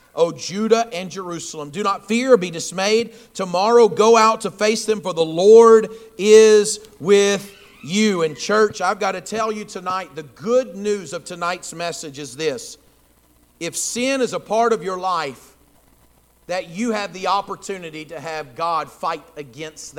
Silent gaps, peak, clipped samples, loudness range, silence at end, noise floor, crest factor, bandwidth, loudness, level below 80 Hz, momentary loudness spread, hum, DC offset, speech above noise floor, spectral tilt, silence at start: none; 0 dBFS; under 0.1%; 11 LU; 0.1 s; -56 dBFS; 18 dB; 15 kHz; -18 LUFS; -62 dBFS; 17 LU; none; under 0.1%; 37 dB; -3.5 dB/octave; 0.15 s